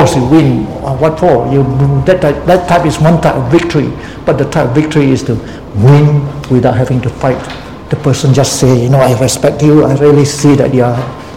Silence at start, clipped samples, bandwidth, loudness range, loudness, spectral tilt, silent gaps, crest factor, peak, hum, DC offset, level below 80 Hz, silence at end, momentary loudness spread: 0 s; 1%; 15.5 kHz; 2 LU; -9 LUFS; -6.5 dB/octave; none; 8 dB; 0 dBFS; none; 0.8%; -30 dBFS; 0 s; 8 LU